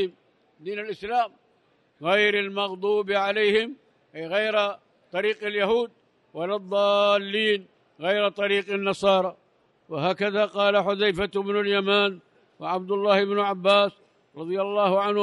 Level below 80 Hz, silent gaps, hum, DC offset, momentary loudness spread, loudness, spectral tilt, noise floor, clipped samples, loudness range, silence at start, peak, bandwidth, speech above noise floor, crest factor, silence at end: -64 dBFS; none; none; under 0.1%; 13 LU; -24 LUFS; -5 dB/octave; -65 dBFS; under 0.1%; 2 LU; 0 s; -8 dBFS; 11 kHz; 41 dB; 18 dB; 0 s